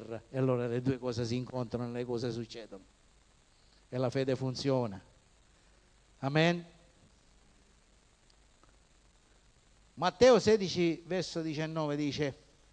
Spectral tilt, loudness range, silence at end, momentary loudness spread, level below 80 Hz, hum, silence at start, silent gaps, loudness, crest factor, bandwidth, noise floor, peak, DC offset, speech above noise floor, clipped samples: -6 dB/octave; 8 LU; 0.4 s; 14 LU; -64 dBFS; none; 0 s; none; -32 LUFS; 22 dB; 9.8 kHz; -65 dBFS; -12 dBFS; under 0.1%; 34 dB; under 0.1%